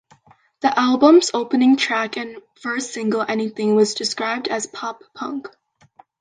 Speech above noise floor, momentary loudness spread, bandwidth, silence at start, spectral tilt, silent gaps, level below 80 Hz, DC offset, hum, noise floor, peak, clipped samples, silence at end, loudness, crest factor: 35 dB; 16 LU; 9.8 kHz; 0.65 s; -3.5 dB/octave; none; -70 dBFS; under 0.1%; none; -54 dBFS; -2 dBFS; under 0.1%; 0.75 s; -19 LUFS; 18 dB